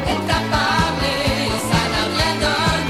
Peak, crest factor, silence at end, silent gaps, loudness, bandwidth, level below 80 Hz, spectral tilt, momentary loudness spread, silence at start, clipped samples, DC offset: -4 dBFS; 16 dB; 0 s; none; -18 LUFS; 16 kHz; -32 dBFS; -4 dB/octave; 2 LU; 0 s; under 0.1%; 0.3%